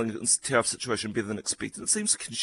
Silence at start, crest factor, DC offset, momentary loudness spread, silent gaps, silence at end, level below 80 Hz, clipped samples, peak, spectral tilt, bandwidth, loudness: 0 s; 20 dB; under 0.1%; 8 LU; none; 0 s; -62 dBFS; under 0.1%; -8 dBFS; -2 dB/octave; 12.5 kHz; -27 LUFS